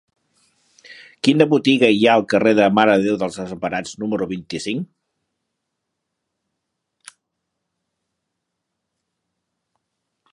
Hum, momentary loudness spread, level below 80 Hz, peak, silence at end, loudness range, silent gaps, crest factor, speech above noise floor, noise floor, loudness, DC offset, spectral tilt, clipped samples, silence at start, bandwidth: none; 12 LU; -62 dBFS; 0 dBFS; 5.5 s; 16 LU; none; 22 dB; 61 dB; -78 dBFS; -17 LUFS; under 0.1%; -5.5 dB/octave; under 0.1%; 0.9 s; 11.5 kHz